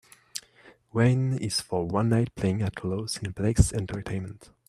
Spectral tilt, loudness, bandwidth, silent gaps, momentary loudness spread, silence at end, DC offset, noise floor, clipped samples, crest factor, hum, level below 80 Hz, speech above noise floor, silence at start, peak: -6 dB/octave; -27 LUFS; 13.5 kHz; none; 16 LU; 0.3 s; under 0.1%; -56 dBFS; under 0.1%; 22 dB; none; -42 dBFS; 30 dB; 0.35 s; -4 dBFS